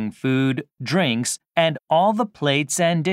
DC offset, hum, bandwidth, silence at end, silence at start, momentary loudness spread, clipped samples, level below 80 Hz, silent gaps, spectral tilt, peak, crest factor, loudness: under 0.1%; none; 16 kHz; 0 s; 0 s; 5 LU; under 0.1%; -70 dBFS; none; -4.5 dB/octave; -2 dBFS; 18 dB; -21 LUFS